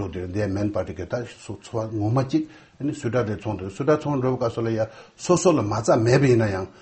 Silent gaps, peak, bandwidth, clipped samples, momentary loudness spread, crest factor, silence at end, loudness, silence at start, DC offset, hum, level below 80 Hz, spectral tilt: none; -4 dBFS; 8.8 kHz; under 0.1%; 12 LU; 18 dB; 0.1 s; -23 LUFS; 0 s; under 0.1%; none; -52 dBFS; -6.5 dB/octave